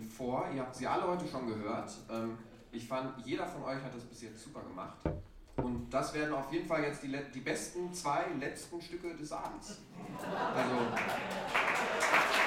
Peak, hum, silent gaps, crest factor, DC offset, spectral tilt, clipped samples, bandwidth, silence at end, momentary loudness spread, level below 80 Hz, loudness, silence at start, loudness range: -14 dBFS; none; none; 22 dB; under 0.1%; -4 dB/octave; under 0.1%; 17 kHz; 0 s; 15 LU; -58 dBFS; -36 LUFS; 0 s; 6 LU